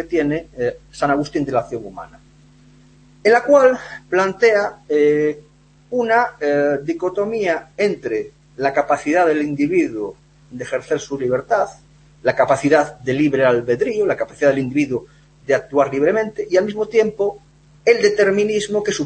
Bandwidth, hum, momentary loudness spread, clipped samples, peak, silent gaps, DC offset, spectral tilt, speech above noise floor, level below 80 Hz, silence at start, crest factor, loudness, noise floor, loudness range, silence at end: 8.8 kHz; none; 11 LU; under 0.1%; 0 dBFS; none; under 0.1%; -5.5 dB/octave; 31 dB; -52 dBFS; 0 s; 18 dB; -18 LUFS; -49 dBFS; 3 LU; 0 s